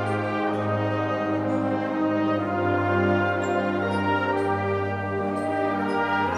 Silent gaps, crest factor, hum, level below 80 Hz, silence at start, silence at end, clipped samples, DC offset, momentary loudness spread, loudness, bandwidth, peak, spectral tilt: none; 14 dB; none; -64 dBFS; 0 s; 0 s; under 0.1%; under 0.1%; 4 LU; -25 LUFS; 10.5 kHz; -10 dBFS; -7.5 dB/octave